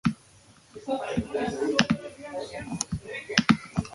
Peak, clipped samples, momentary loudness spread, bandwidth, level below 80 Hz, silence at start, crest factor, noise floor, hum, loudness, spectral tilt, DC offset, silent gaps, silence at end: 0 dBFS; under 0.1%; 13 LU; 11.5 kHz; -50 dBFS; 0.05 s; 28 dB; -56 dBFS; none; -28 LUFS; -4.5 dB/octave; under 0.1%; none; 0 s